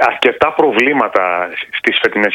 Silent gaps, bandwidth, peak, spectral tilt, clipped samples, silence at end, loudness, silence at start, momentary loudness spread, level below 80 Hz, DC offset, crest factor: none; 16 kHz; 0 dBFS; -4.5 dB/octave; 0.2%; 0 s; -13 LUFS; 0 s; 5 LU; -52 dBFS; under 0.1%; 14 dB